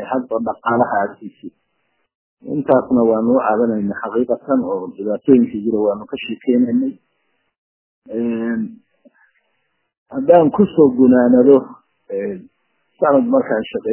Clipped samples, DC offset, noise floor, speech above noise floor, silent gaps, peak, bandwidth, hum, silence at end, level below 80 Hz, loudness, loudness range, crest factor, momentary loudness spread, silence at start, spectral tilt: under 0.1%; under 0.1%; -69 dBFS; 53 dB; 2.15-2.37 s, 7.58-8.02 s, 9.98-10.06 s; 0 dBFS; 3.2 kHz; none; 0 s; -56 dBFS; -16 LUFS; 8 LU; 18 dB; 14 LU; 0 s; -11.5 dB/octave